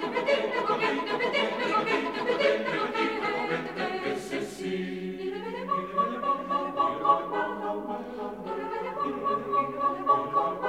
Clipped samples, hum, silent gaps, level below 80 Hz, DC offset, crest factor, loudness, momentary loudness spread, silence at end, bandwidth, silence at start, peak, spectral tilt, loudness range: under 0.1%; none; none; -64 dBFS; under 0.1%; 20 dB; -28 LUFS; 9 LU; 0 s; 15.5 kHz; 0 s; -10 dBFS; -5 dB/octave; 4 LU